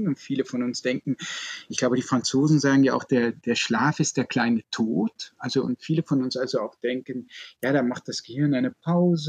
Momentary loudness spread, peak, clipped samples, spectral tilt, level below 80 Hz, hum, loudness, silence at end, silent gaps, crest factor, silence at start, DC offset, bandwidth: 10 LU; -8 dBFS; under 0.1%; -5 dB/octave; -70 dBFS; none; -25 LUFS; 0 s; none; 16 dB; 0 s; under 0.1%; 14.5 kHz